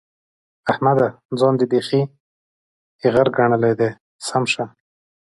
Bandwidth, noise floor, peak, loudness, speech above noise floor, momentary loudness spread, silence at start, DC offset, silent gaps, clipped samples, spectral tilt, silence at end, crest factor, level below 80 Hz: 11.5 kHz; under -90 dBFS; -2 dBFS; -19 LUFS; over 72 dB; 8 LU; 0.65 s; under 0.1%; 1.25-1.29 s, 2.20-2.99 s, 4.00-4.19 s; under 0.1%; -6 dB/octave; 0.55 s; 18 dB; -58 dBFS